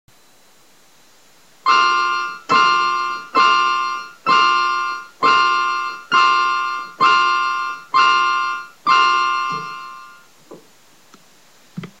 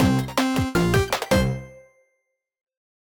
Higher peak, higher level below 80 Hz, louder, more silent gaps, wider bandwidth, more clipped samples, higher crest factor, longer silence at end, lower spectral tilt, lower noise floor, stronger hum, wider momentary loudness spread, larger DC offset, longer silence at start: first, -2 dBFS vs -6 dBFS; second, -70 dBFS vs -38 dBFS; first, -16 LUFS vs -22 LUFS; neither; second, 12.5 kHz vs 19.5 kHz; neither; about the same, 16 dB vs 18 dB; second, 0.15 s vs 1.2 s; second, -1.5 dB/octave vs -5.5 dB/octave; second, -53 dBFS vs -75 dBFS; neither; first, 11 LU vs 4 LU; first, 0.3% vs under 0.1%; first, 1.65 s vs 0 s